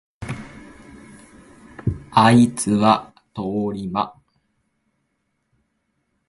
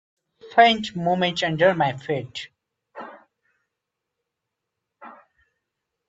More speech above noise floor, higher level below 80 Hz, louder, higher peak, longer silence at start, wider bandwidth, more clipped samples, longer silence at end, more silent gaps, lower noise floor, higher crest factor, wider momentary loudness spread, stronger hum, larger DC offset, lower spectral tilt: second, 55 dB vs 62 dB; first, -48 dBFS vs -64 dBFS; about the same, -19 LUFS vs -21 LUFS; about the same, 0 dBFS vs -2 dBFS; second, 0.2 s vs 0.45 s; first, 11.5 kHz vs 7.8 kHz; neither; first, 2.2 s vs 0.95 s; neither; second, -72 dBFS vs -83 dBFS; about the same, 22 dB vs 24 dB; second, 19 LU vs 24 LU; neither; neither; about the same, -5.5 dB/octave vs -5 dB/octave